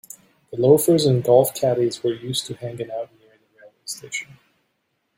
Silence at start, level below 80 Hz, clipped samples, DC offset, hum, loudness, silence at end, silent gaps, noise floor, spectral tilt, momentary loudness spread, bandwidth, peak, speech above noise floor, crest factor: 0.5 s; -62 dBFS; under 0.1%; under 0.1%; none; -20 LUFS; 0.95 s; none; -72 dBFS; -5.5 dB/octave; 18 LU; 16.5 kHz; -2 dBFS; 52 dB; 20 dB